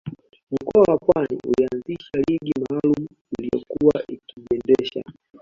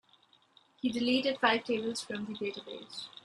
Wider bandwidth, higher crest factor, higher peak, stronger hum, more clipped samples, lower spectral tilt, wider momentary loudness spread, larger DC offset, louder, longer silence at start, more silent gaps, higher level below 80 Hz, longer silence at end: second, 7.4 kHz vs 12 kHz; second, 18 dB vs 24 dB; first, -2 dBFS vs -10 dBFS; neither; neither; first, -8 dB/octave vs -3.5 dB/octave; about the same, 14 LU vs 15 LU; neither; first, -22 LUFS vs -32 LUFS; second, 0.05 s vs 0.85 s; first, 0.43-0.47 s, 3.21-3.25 s vs none; first, -52 dBFS vs -76 dBFS; first, 0.3 s vs 0.15 s